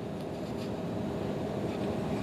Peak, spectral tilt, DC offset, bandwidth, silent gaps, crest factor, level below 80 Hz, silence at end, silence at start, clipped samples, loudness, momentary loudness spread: -22 dBFS; -7 dB/octave; under 0.1%; 15 kHz; none; 12 dB; -54 dBFS; 0 s; 0 s; under 0.1%; -35 LUFS; 4 LU